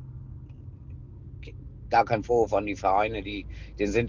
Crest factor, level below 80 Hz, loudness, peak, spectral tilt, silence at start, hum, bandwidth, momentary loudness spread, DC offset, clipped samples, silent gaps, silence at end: 20 dB; -44 dBFS; -26 LUFS; -8 dBFS; -6.5 dB/octave; 0 s; none; 7.6 kHz; 20 LU; under 0.1%; under 0.1%; none; 0 s